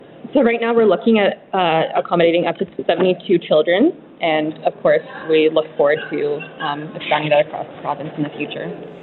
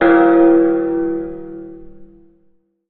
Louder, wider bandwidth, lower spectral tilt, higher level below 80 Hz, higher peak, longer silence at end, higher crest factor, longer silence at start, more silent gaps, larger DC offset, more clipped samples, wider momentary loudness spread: second, -18 LUFS vs -13 LUFS; about the same, 4.3 kHz vs 4 kHz; about the same, -10 dB/octave vs -10.5 dB/octave; second, -64 dBFS vs -46 dBFS; about the same, 0 dBFS vs -2 dBFS; second, 0 s vs 0.85 s; about the same, 18 dB vs 14 dB; about the same, 0.1 s vs 0 s; neither; neither; neither; second, 10 LU vs 23 LU